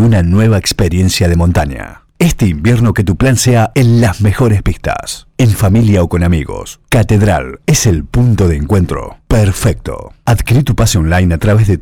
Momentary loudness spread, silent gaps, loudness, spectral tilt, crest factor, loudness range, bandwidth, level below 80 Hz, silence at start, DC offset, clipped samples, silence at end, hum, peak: 8 LU; none; -11 LUFS; -6 dB/octave; 8 dB; 1 LU; 16.5 kHz; -24 dBFS; 0 s; 0.5%; under 0.1%; 0 s; none; -2 dBFS